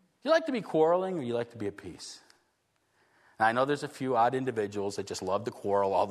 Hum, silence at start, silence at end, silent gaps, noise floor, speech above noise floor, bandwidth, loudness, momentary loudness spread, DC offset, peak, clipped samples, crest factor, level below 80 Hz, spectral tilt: none; 0.25 s; 0 s; none; -74 dBFS; 45 dB; 13.5 kHz; -30 LUFS; 13 LU; under 0.1%; -12 dBFS; under 0.1%; 18 dB; -74 dBFS; -5 dB/octave